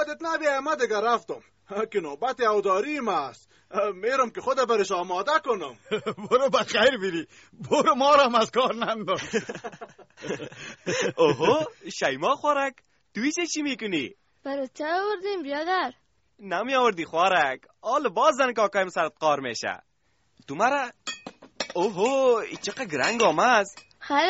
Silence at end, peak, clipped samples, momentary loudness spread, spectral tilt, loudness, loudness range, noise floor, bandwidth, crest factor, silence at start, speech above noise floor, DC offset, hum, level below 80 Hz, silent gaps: 0 s; -6 dBFS; under 0.1%; 14 LU; -2 dB/octave; -25 LUFS; 5 LU; -70 dBFS; 8 kHz; 18 dB; 0 s; 45 dB; under 0.1%; none; -68 dBFS; none